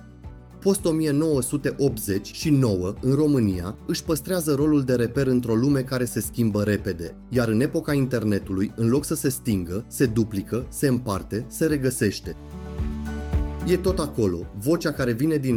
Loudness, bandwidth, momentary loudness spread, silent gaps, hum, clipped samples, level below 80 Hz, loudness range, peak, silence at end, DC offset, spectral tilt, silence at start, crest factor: -24 LUFS; 17.5 kHz; 9 LU; none; none; under 0.1%; -38 dBFS; 3 LU; -8 dBFS; 0 s; under 0.1%; -6 dB/octave; 0 s; 14 dB